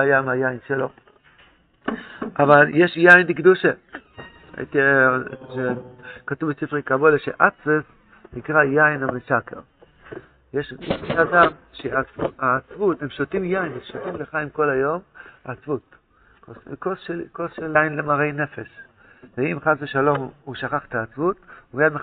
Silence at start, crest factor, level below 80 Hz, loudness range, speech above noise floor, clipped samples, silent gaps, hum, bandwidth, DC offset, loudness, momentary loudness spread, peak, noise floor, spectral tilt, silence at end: 0 s; 22 dB; -56 dBFS; 9 LU; 34 dB; under 0.1%; none; none; 4.8 kHz; under 0.1%; -20 LUFS; 20 LU; 0 dBFS; -55 dBFS; -4.5 dB/octave; 0 s